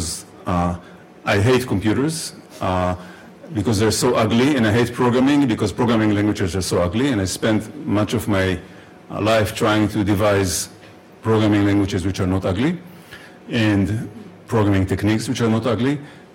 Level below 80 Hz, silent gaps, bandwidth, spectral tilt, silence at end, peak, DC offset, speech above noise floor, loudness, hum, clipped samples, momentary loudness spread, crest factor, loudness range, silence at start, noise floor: -44 dBFS; none; 16.5 kHz; -5.5 dB/octave; 0.15 s; -8 dBFS; under 0.1%; 22 dB; -19 LUFS; none; under 0.1%; 12 LU; 10 dB; 4 LU; 0 s; -41 dBFS